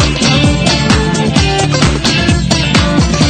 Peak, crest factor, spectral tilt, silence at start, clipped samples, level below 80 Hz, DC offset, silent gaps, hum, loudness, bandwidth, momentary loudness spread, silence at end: 0 dBFS; 10 dB; -4.5 dB/octave; 0 s; under 0.1%; -20 dBFS; under 0.1%; none; none; -10 LUFS; 10.5 kHz; 2 LU; 0 s